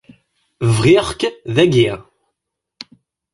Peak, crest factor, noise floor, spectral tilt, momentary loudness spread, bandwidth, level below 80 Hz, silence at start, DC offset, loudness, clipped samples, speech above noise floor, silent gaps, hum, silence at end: 0 dBFS; 16 dB; -79 dBFS; -6 dB/octave; 25 LU; 11.5 kHz; -44 dBFS; 0.6 s; under 0.1%; -15 LUFS; under 0.1%; 65 dB; none; none; 1.35 s